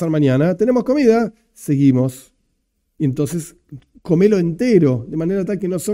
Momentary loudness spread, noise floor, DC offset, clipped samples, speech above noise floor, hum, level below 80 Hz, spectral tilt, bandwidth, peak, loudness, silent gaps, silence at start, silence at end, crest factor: 10 LU; -68 dBFS; under 0.1%; under 0.1%; 52 dB; none; -50 dBFS; -7.5 dB/octave; 16 kHz; 0 dBFS; -17 LUFS; none; 0 s; 0 s; 16 dB